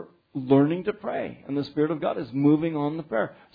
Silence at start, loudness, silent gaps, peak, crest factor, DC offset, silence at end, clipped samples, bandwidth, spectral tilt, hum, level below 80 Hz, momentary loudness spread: 0 s; -25 LUFS; none; -8 dBFS; 18 dB; under 0.1%; 0.2 s; under 0.1%; 5 kHz; -10.5 dB/octave; none; -64 dBFS; 10 LU